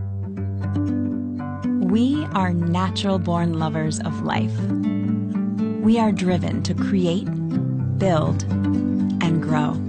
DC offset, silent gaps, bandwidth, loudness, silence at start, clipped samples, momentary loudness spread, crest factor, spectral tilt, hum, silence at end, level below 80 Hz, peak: under 0.1%; none; 9.2 kHz; -22 LUFS; 0 s; under 0.1%; 6 LU; 12 dB; -7 dB/octave; none; 0 s; -54 dBFS; -8 dBFS